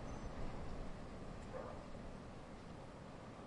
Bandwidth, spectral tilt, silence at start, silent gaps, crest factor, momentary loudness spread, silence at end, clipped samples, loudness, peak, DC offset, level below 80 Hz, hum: 11 kHz; -6.5 dB/octave; 0 s; none; 16 dB; 5 LU; 0 s; under 0.1%; -52 LUFS; -34 dBFS; under 0.1%; -54 dBFS; none